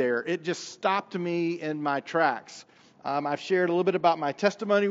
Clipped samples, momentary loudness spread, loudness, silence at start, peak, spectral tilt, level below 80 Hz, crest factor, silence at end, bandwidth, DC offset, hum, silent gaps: under 0.1%; 9 LU; -27 LUFS; 0 s; -8 dBFS; -4 dB/octave; -84 dBFS; 18 dB; 0 s; 8 kHz; under 0.1%; none; none